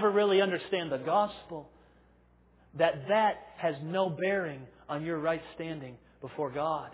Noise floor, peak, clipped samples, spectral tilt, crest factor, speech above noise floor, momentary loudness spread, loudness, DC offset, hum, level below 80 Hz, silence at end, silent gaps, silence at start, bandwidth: -63 dBFS; -12 dBFS; under 0.1%; -3.5 dB/octave; 18 dB; 32 dB; 18 LU; -31 LUFS; under 0.1%; none; -66 dBFS; 0 s; none; 0 s; 4 kHz